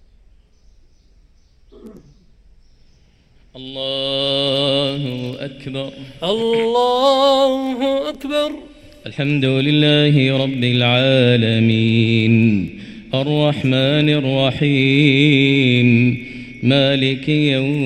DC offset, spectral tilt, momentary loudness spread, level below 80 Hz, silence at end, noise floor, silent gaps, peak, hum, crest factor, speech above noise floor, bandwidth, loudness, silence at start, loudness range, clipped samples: under 0.1%; -7 dB/octave; 14 LU; -50 dBFS; 0 s; -51 dBFS; none; 0 dBFS; none; 16 dB; 36 dB; 11 kHz; -16 LUFS; 1.85 s; 7 LU; under 0.1%